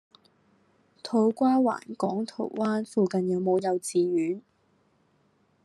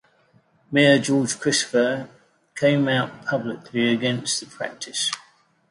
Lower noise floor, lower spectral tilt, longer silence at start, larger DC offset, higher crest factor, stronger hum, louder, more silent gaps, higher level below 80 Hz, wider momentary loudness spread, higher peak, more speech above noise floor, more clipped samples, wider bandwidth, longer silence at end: first, -67 dBFS vs -60 dBFS; first, -6.5 dB/octave vs -4 dB/octave; first, 1.05 s vs 0.7 s; neither; about the same, 16 dB vs 20 dB; neither; second, -27 LUFS vs -22 LUFS; neither; second, -78 dBFS vs -66 dBFS; second, 9 LU vs 14 LU; second, -12 dBFS vs -4 dBFS; about the same, 41 dB vs 38 dB; neither; about the same, 12.5 kHz vs 11.5 kHz; first, 1.25 s vs 0.5 s